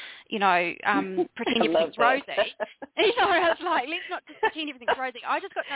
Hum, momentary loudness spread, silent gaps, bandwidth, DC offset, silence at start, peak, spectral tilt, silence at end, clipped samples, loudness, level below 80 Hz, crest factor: none; 9 LU; none; 4 kHz; under 0.1%; 0 s; -8 dBFS; -7.5 dB/octave; 0 s; under 0.1%; -25 LUFS; -64 dBFS; 18 dB